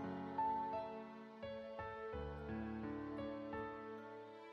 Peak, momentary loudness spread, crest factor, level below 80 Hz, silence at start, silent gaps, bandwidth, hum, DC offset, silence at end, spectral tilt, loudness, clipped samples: -32 dBFS; 11 LU; 16 dB; -62 dBFS; 0 s; none; 7.2 kHz; none; under 0.1%; 0 s; -8 dB/octave; -47 LUFS; under 0.1%